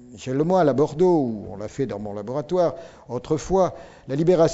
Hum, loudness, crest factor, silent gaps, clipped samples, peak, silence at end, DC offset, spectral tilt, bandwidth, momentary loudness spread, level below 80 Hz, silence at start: none; -23 LUFS; 16 dB; none; under 0.1%; -6 dBFS; 0 s; under 0.1%; -7.5 dB/octave; 8 kHz; 14 LU; -48 dBFS; 0 s